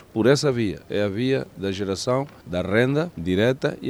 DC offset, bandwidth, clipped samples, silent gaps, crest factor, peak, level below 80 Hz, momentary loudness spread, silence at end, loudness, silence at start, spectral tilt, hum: under 0.1%; 16 kHz; under 0.1%; none; 18 dB; -4 dBFS; -52 dBFS; 8 LU; 0 s; -23 LUFS; 0.15 s; -6 dB/octave; none